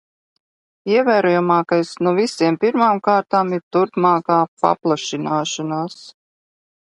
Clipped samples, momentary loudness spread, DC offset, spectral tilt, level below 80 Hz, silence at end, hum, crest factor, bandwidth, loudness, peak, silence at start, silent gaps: under 0.1%; 7 LU; under 0.1%; -5.5 dB/octave; -68 dBFS; 0.75 s; none; 18 dB; 11.5 kHz; -18 LUFS; 0 dBFS; 0.85 s; 3.63-3.71 s, 4.48-4.57 s